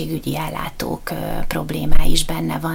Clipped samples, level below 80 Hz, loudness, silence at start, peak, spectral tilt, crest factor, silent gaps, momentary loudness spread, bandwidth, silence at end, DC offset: under 0.1%; -22 dBFS; -23 LUFS; 0 s; 0 dBFS; -4.5 dB/octave; 14 dB; none; 6 LU; 16.5 kHz; 0 s; under 0.1%